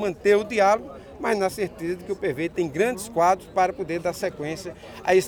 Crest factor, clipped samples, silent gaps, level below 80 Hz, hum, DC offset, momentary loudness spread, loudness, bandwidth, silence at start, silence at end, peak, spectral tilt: 18 dB; under 0.1%; none; -54 dBFS; none; under 0.1%; 11 LU; -24 LUFS; over 20 kHz; 0 s; 0 s; -6 dBFS; -5 dB/octave